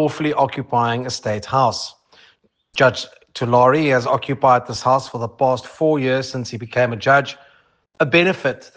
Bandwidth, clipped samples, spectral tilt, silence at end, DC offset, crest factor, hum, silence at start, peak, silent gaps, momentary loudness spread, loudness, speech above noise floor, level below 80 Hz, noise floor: 9.8 kHz; under 0.1%; -5.5 dB/octave; 0.15 s; under 0.1%; 18 dB; none; 0 s; -2 dBFS; none; 12 LU; -18 LUFS; 39 dB; -60 dBFS; -57 dBFS